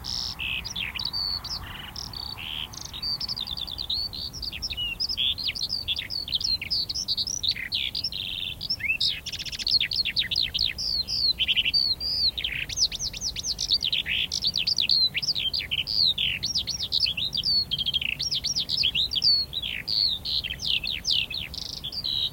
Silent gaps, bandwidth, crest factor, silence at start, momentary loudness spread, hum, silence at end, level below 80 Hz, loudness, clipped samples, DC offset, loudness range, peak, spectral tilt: none; 17 kHz; 18 dB; 0 s; 10 LU; none; 0 s; -48 dBFS; -25 LUFS; under 0.1%; under 0.1%; 7 LU; -10 dBFS; -0.5 dB/octave